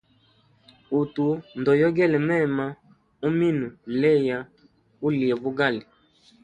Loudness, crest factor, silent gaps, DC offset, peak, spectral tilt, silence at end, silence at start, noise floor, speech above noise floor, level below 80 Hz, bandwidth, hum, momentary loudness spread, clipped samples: -24 LUFS; 16 dB; none; under 0.1%; -8 dBFS; -8.5 dB/octave; 0.6 s; 0.9 s; -61 dBFS; 39 dB; -62 dBFS; 9.2 kHz; none; 10 LU; under 0.1%